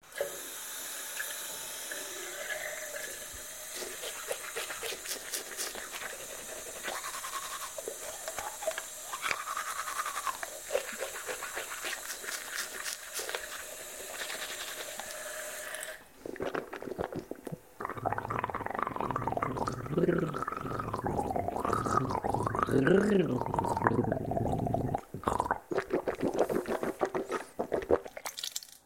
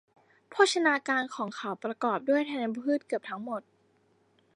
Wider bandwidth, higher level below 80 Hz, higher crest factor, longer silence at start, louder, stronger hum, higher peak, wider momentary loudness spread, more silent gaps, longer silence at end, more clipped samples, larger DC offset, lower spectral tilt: first, 16.5 kHz vs 11.5 kHz; first, -56 dBFS vs -86 dBFS; first, 30 dB vs 22 dB; second, 0.05 s vs 0.5 s; second, -35 LUFS vs -29 LUFS; neither; about the same, -6 dBFS vs -8 dBFS; second, 9 LU vs 12 LU; neither; second, 0.1 s vs 0.95 s; neither; neither; about the same, -4 dB/octave vs -3.5 dB/octave